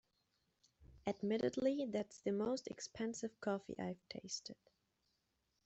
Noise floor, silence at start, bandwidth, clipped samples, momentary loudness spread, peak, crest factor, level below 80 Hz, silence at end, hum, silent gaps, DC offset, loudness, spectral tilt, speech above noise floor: -84 dBFS; 0.8 s; 8.2 kHz; under 0.1%; 9 LU; -24 dBFS; 20 dB; -76 dBFS; 1.15 s; none; none; under 0.1%; -42 LUFS; -5 dB/octave; 43 dB